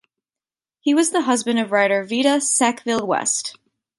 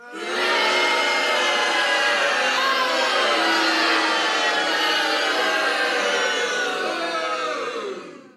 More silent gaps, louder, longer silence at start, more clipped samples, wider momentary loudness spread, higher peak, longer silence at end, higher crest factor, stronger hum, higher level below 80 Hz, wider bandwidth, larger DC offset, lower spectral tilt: neither; about the same, -19 LUFS vs -20 LUFS; first, 0.85 s vs 0 s; neither; about the same, 6 LU vs 6 LU; first, -4 dBFS vs -8 dBFS; first, 0.45 s vs 0.1 s; about the same, 18 dB vs 14 dB; neither; first, -68 dBFS vs -80 dBFS; second, 11.5 kHz vs 14.5 kHz; neither; first, -2 dB/octave vs 0 dB/octave